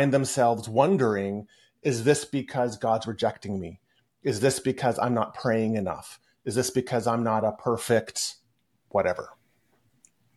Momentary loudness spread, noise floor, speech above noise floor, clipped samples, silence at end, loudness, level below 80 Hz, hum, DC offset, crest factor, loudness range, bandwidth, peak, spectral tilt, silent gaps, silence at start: 11 LU; -71 dBFS; 46 dB; under 0.1%; 1.05 s; -26 LUFS; -64 dBFS; none; under 0.1%; 20 dB; 3 LU; 12.5 kHz; -6 dBFS; -5 dB/octave; none; 0 s